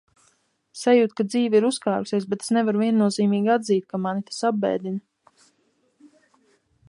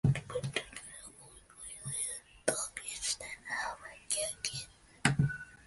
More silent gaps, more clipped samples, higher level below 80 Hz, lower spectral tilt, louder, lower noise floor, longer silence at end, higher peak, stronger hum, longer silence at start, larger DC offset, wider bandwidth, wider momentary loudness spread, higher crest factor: neither; neither; second, -72 dBFS vs -58 dBFS; first, -5.5 dB/octave vs -3.5 dB/octave; first, -22 LUFS vs -36 LUFS; first, -67 dBFS vs -57 dBFS; first, 1.9 s vs 0 s; first, -6 dBFS vs -10 dBFS; neither; first, 0.75 s vs 0.05 s; neither; about the same, 11.5 kHz vs 12 kHz; second, 8 LU vs 16 LU; second, 18 dB vs 26 dB